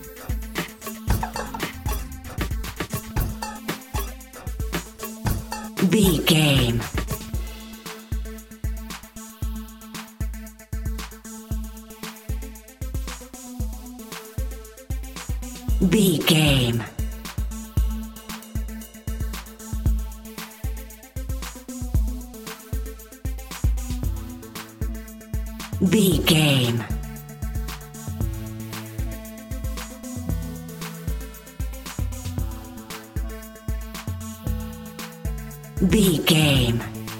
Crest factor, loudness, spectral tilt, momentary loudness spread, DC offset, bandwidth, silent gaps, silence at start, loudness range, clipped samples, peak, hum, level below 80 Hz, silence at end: 22 dB; -26 LUFS; -5 dB/octave; 18 LU; under 0.1%; 17 kHz; none; 0 s; 12 LU; under 0.1%; -4 dBFS; none; -32 dBFS; 0 s